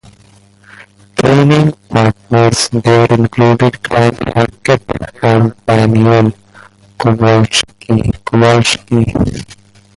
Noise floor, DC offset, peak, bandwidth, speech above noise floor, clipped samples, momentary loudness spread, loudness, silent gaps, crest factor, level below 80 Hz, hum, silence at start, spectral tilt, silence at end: -44 dBFS; under 0.1%; 0 dBFS; 11.5 kHz; 34 dB; under 0.1%; 6 LU; -11 LUFS; none; 12 dB; -34 dBFS; none; 0.8 s; -6 dB/octave; 0.45 s